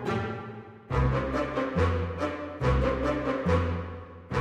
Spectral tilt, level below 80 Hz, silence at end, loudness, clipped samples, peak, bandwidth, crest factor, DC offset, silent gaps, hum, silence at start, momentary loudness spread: -7.5 dB/octave; -36 dBFS; 0 s; -29 LUFS; under 0.1%; -12 dBFS; 9 kHz; 16 dB; under 0.1%; none; none; 0 s; 12 LU